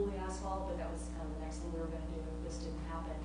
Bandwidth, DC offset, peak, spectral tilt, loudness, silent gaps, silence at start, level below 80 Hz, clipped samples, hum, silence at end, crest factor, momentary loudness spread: 10 kHz; under 0.1%; -26 dBFS; -6.5 dB/octave; -42 LUFS; none; 0 s; -44 dBFS; under 0.1%; 60 Hz at -45 dBFS; 0 s; 14 dB; 3 LU